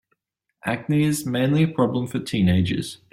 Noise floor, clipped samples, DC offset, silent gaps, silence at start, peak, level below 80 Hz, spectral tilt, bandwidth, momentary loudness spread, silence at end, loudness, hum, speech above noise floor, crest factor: -73 dBFS; under 0.1%; under 0.1%; none; 0.65 s; -8 dBFS; -54 dBFS; -6.5 dB/octave; 16 kHz; 8 LU; 0.15 s; -22 LUFS; none; 51 dB; 16 dB